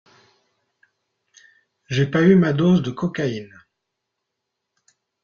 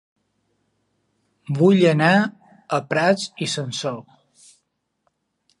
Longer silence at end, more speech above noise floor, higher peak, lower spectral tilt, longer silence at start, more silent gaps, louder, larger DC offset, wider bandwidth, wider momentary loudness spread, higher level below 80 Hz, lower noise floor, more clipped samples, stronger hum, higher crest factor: first, 1.8 s vs 1.6 s; first, 62 dB vs 54 dB; about the same, -4 dBFS vs -2 dBFS; first, -7.5 dB/octave vs -5.5 dB/octave; first, 1.9 s vs 1.5 s; neither; about the same, -19 LUFS vs -20 LUFS; neither; second, 7 kHz vs 11.5 kHz; about the same, 12 LU vs 13 LU; first, -58 dBFS vs -70 dBFS; first, -80 dBFS vs -73 dBFS; neither; neither; about the same, 20 dB vs 20 dB